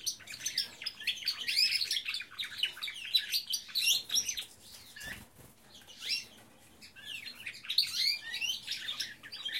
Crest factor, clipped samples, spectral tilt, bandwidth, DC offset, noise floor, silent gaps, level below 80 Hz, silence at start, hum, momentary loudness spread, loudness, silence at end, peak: 22 dB; under 0.1%; 2 dB/octave; 16.5 kHz; under 0.1%; -58 dBFS; none; -72 dBFS; 0 s; none; 17 LU; -32 LUFS; 0 s; -14 dBFS